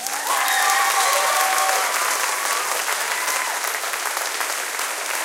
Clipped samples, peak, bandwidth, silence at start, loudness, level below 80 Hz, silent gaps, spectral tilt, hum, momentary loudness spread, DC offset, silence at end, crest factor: under 0.1%; -2 dBFS; 17 kHz; 0 s; -20 LUFS; -80 dBFS; none; 3 dB/octave; none; 6 LU; under 0.1%; 0 s; 18 dB